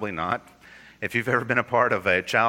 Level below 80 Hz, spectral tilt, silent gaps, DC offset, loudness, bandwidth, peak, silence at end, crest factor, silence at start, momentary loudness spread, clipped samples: -60 dBFS; -5 dB/octave; none; under 0.1%; -24 LUFS; 17 kHz; -4 dBFS; 0 s; 20 dB; 0 s; 8 LU; under 0.1%